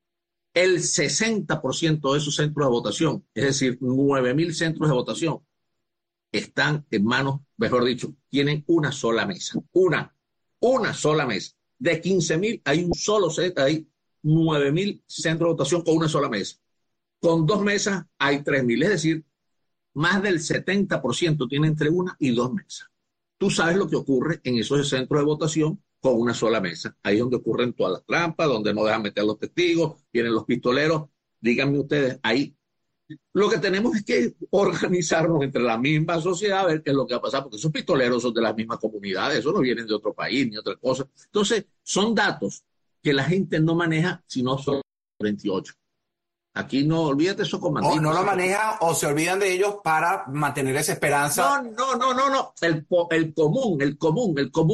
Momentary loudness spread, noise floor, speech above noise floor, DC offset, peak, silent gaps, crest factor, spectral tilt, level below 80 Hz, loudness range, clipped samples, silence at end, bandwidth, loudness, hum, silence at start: 7 LU; -85 dBFS; 62 dB; under 0.1%; -8 dBFS; none; 16 dB; -5 dB/octave; -58 dBFS; 3 LU; under 0.1%; 0 s; 12 kHz; -23 LUFS; none; 0.55 s